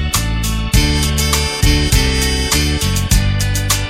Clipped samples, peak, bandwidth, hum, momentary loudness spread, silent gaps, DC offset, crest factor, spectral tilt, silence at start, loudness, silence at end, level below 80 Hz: under 0.1%; 0 dBFS; 17 kHz; none; 3 LU; none; under 0.1%; 14 dB; -3.5 dB/octave; 0 s; -15 LUFS; 0 s; -18 dBFS